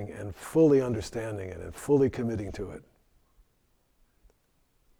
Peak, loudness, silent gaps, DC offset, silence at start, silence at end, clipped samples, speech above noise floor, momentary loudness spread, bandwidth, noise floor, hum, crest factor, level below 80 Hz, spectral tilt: -12 dBFS; -28 LUFS; none; under 0.1%; 0 s; 2.2 s; under 0.1%; 42 dB; 18 LU; 16 kHz; -70 dBFS; none; 18 dB; -52 dBFS; -7.5 dB/octave